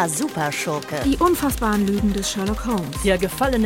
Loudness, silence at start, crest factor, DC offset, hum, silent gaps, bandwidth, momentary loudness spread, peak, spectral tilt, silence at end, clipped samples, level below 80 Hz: -21 LUFS; 0 s; 16 dB; under 0.1%; none; none; 19.5 kHz; 5 LU; -6 dBFS; -4.5 dB/octave; 0 s; under 0.1%; -34 dBFS